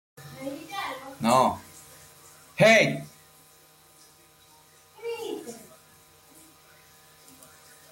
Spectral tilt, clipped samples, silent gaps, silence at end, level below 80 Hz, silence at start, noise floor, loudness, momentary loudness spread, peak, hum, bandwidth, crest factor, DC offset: -4 dB/octave; under 0.1%; none; 2.35 s; -68 dBFS; 0.2 s; -57 dBFS; -24 LUFS; 28 LU; -8 dBFS; none; 16.5 kHz; 22 dB; under 0.1%